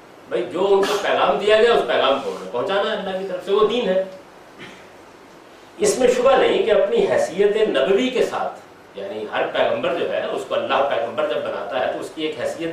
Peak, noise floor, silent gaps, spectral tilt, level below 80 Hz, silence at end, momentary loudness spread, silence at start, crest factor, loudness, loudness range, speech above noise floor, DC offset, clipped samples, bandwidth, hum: -4 dBFS; -44 dBFS; none; -3.5 dB/octave; -56 dBFS; 0 s; 11 LU; 0.15 s; 16 dB; -20 LUFS; 5 LU; 25 dB; under 0.1%; under 0.1%; 14.5 kHz; none